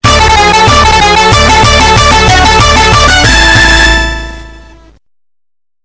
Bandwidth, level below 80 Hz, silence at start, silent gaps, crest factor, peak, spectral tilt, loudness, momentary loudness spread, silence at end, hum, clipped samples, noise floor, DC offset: 8 kHz; -14 dBFS; 0.05 s; none; 6 dB; 0 dBFS; -3 dB/octave; -4 LUFS; 3 LU; 1.25 s; none; 8%; -66 dBFS; under 0.1%